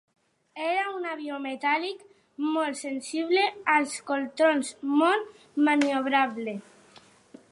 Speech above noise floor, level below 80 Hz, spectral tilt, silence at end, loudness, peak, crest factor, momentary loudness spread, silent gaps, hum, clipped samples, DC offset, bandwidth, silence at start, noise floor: 29 dB; -82 dBFS; -3 dB/octave; 0.9 s; -27 LUFS; -8 dBFS; 20 dB; 12 LU; none; none; under 0.1%; under 0.1%; 11.5 kHz; 0.55 s; -56 dBFS